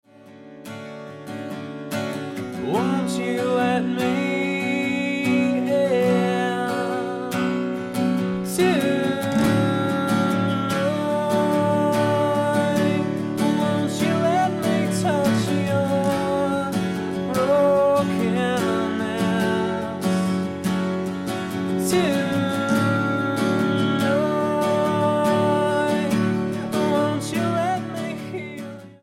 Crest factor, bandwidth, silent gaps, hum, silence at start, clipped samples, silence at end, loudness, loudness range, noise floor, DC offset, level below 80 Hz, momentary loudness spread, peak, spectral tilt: 14 dB; 16.5 kHz; none; none; 0.25 s; under 0.1%; 0.1 s; -22 LUFS; 3 LU; -45 dBFS; under 0.1%; -58 dBFS; 8 LU; -6 dBFS; -6 dB/octave